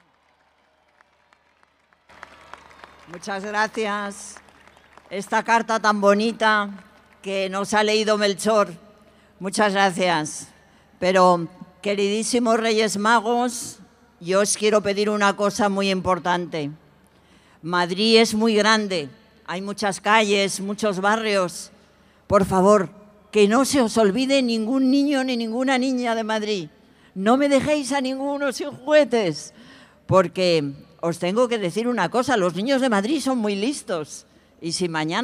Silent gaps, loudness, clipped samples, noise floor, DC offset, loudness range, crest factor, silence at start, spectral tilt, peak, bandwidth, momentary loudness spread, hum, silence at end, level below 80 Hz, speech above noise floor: none; -21 LUFS; under 0.1%; -62 dBFS; under 0.1%; 3 LU; 20 dB; 3.1 s; -4 dB/octave; -2 dBFS; 15.5 kHz; 14 LU; none; 0 s; -58 dBFS; 41 dB